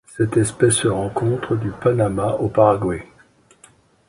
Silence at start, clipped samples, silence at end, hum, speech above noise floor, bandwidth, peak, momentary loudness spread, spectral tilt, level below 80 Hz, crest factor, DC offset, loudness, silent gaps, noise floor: 0.1 s; under 0.1%; 1.05 s; none; 35 dB; 11.5 kHz; 0 dBFS; 6 LU; -5.5 dB/octave; -46 dBFS; 20 dB; under 0.1%; -19 LUFS; none; -53 dBFS